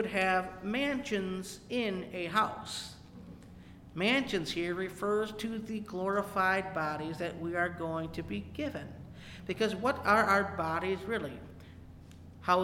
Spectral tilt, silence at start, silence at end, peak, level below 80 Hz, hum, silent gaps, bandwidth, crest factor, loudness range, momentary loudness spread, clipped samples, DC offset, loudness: -5 dB/octave; 0 s; 0 s; -12 dBFS; -58 dBFS; none; none; 16.5 kHz; 20 dB; 3 LU; 22 LU; under 0.1%; under 0.1%; -33 LUFS